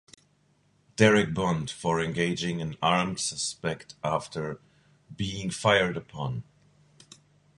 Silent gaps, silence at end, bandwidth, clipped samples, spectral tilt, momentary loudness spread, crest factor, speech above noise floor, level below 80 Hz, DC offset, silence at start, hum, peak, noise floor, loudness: none; 1.15 s; 11.5 kHz; under 0.1%; -4.5 dB/octave; 13 LU; 24 dB; 39 dB; -56 dBFS; under 0.1%; 1 s; none; -4 dBFS; -66 dBFS; -27 LUFS